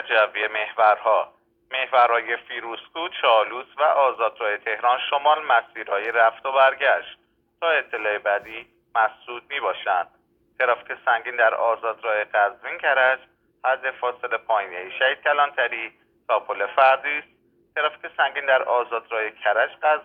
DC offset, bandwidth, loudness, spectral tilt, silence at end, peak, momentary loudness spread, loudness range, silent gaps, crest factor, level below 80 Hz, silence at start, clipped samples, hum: under 0.1%; 4.7 kHz; -22 LUFS; -4 dB/octave; 0 s; -4 dBFS; 10 LU; 3 LU; none; 18 dB; -74 dBFS; 0 s; under 0.1%; none